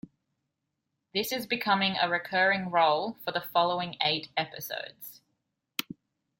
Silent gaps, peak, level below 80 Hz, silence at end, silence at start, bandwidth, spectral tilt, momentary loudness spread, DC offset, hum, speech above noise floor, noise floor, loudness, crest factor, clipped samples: none; -8 dBFS; -74 dBFS; 0.6 s; 1.15 s; 17 kHz; -3.5 dB/octave; 12 LU; under 0.1%; none; 54 dB; -83 dBFS; -28 LUFS; 22 dB; under 0.1%